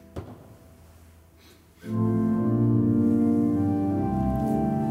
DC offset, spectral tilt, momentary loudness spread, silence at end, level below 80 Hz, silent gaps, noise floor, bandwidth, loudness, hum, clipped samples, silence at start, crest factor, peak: under 0.1%; -10 dB/octave; 17 LU; 0 s; -44 dBFS; none; -54 dBFS; 13 kHz; -24 LUFS; none; under 0.1%; 0.15 s; 14 dB; -12 dBFS